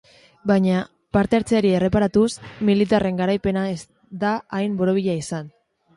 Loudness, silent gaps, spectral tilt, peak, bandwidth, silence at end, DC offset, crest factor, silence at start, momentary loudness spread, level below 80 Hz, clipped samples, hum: -21 LUFS; none; -6.5 dB/octave; -4 dBFS; 11.5 kHz; 0.5 s; under 0.1%; 18 dB; 0.45 s; 9 LU; -46 dBFS; under 0.1%; none